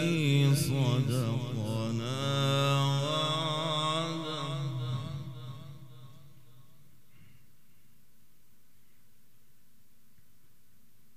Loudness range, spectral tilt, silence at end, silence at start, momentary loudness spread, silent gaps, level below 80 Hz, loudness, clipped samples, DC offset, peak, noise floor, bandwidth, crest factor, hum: 16 LU; -5.5 dB/octave; 5.05 s; 0 s; 17 LU; none; -68 dBFS; -30 LUFS; under 0.1%; 0.4%; -16 dBFS; -68 dBFS; 15 kHz; 18 dB; none